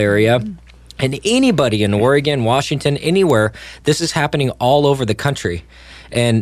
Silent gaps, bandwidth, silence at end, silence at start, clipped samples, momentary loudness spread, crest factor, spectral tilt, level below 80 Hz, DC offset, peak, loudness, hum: none; 15 kHz; 0 s; 0 s; under 0.1%; 9 LU; 14 dB; -5.5 dB/octave; -42 dBFS; under 0.1%; -2 dBFS; -16 LUFS; none